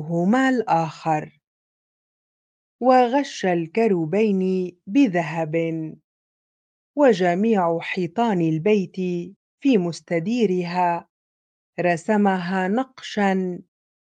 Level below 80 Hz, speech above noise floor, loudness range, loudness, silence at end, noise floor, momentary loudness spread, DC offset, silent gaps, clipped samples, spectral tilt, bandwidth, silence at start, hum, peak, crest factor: -72 dBFS; over 69 dB; 3 LU; -21 LUFS; 0.45 s; under -90 dBFS; 9 LU; under 0.1%; 1.47-2.79 s, 6.04-6.94 s, 9.36-9.58 s, 11.09-11.73 s; under 0.1%; -7 dB/octave; 9.2 kHz; 0 s; none; -2 dBFS; 20 dB